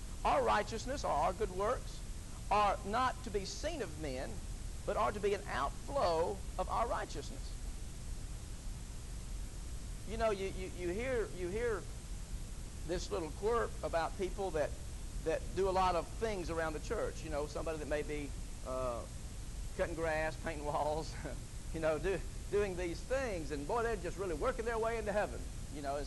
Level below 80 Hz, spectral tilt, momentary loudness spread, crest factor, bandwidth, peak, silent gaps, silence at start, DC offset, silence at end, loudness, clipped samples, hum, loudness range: -46 dBFS; -5 dB/octave; 13 LU; 16 dB; 12 kHz; -22 dBFS; none; 0 s; under 0.1%; 0 s; -38 LUFS; under 0.1%; none; 4 LU